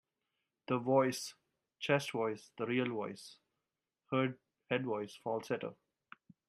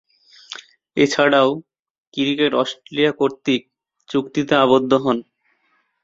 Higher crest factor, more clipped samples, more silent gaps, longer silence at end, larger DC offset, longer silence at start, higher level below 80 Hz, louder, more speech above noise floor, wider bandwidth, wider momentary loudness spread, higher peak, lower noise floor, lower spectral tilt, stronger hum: about the same, 22 dB vs 18 dB; neither; second, none vs 1.79-1.83 s, 1.90-2.12 s; about the same, 0.75 s vs 0.8 s; neither; first, 0.7 s vs 0.5 s; second, -84 dBFS vs -60 dBFS; second, -37 LUFS vs -18 LUFS; first, 54 dB vs 48 dB; first, 15.5 kHz vs 7.8 kHz; about the same, 15 LU vs 16 LU; second, -16 dBFS vs -2 dBFS; first, -90 dBFS vs -65 dBFS; about the same, -5.5 dB/octave vs -5 dB/octave; neither